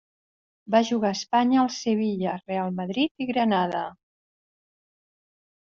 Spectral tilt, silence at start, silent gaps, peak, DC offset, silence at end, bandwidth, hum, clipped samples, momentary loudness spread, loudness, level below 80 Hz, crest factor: -4.5 dB/octave; 0.7 s; 3.11-3.15 s; -8 dBFS; under 0.1%; 1.75 s; 7.6 kHz; none; under 0.1%; 7 LU; -25 LUFS; -70 dBFS; 20 dB